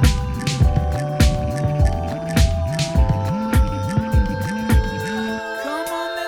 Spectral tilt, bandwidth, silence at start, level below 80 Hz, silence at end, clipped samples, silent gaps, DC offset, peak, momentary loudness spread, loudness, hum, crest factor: -6 dB/octave; 17 kHz; 0 s; -22 dBFS; 0 s; under 0.1%; none; under 0.1%; -2 dBFS; 6 LU; -20 LUFS; none; 16 dB